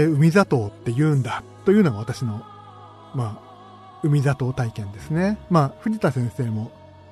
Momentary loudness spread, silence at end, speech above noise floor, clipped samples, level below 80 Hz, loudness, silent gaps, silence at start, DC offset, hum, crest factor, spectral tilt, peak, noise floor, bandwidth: 15 LU; 0.4 s; 23 dB; under 0.1%; -52 dBFS; -22 LUFS; none; 0 s; under 0.1%; none; 18 dB; -8 dB/octave; -4 dBFS; -44 dBFS; 13.5 kHz